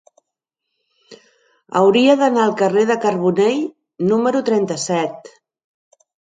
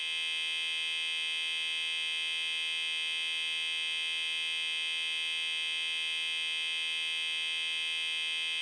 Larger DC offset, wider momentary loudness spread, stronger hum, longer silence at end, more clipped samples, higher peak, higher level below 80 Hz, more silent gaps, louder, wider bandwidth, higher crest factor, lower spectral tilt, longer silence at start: neither; first, 10 LU vs 0 LU; neither; first, 1.2 s vs 0 s; neither; first, 0 dBFS vs -22 dBFS; first, -68 dBFS vs under -90 dBFS; neither; first, -17 LUFS vs -31 LUFS; second, 9.4 kHz vs 11 kHz; first, 18 dB vs 10 dB; first, -5 dB/octave vs 5.5 dB/octave; first, 1.1 s vs 0 s